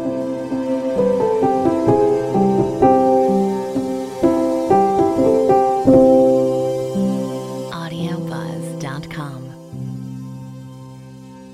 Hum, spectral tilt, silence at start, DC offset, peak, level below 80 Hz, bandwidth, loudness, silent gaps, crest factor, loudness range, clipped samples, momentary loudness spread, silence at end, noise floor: none; -7.5 dB/octave; 0 s; under 0.1%; -2 dBFS; -48 dBFS; 14.5 kHz; -17 LUFS; none; 16 dB; 13 LU; under 0.1%; 18 LU; 0 s; -37 dBFS